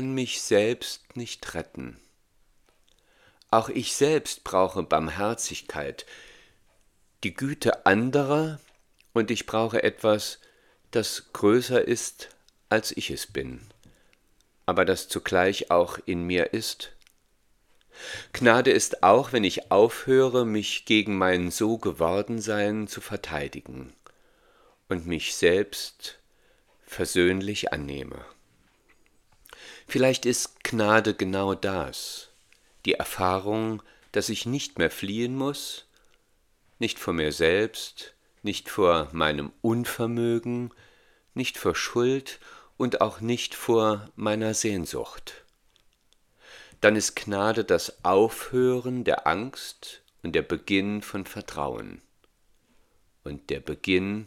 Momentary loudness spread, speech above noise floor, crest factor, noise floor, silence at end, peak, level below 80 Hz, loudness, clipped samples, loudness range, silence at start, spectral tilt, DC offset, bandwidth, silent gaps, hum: 17 LU; 40 dB; 26 dB; -66 dBFS; 0 s; 0 dBFS; -56 dBFS; -26 LUFS; under 0.1%; 7 LU; 0 s; -4 dB/octave; under 0.1%; 17 kHz; none; none